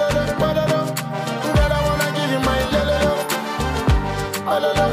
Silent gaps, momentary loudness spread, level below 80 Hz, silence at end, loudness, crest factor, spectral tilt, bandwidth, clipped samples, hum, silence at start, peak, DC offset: none; 6 LU; -28 dBFS; 0 s; -20 LUFS; 10 dB; -5 dB/octave; 16.5 kHz; under 0.1%; none; 0 s; -8 dBFS; under 0.1%